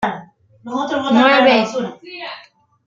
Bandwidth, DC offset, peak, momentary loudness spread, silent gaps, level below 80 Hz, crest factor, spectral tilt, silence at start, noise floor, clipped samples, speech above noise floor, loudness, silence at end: 7.6 kHz; under 0.1%; 0 dBFS; 21 LU; none; -60 dBFS; 18 dB; -4.5 dB/octave; 0 s; -46 dBFS; under 0.1%; 30 dB; -15 LUFS; 0.45 s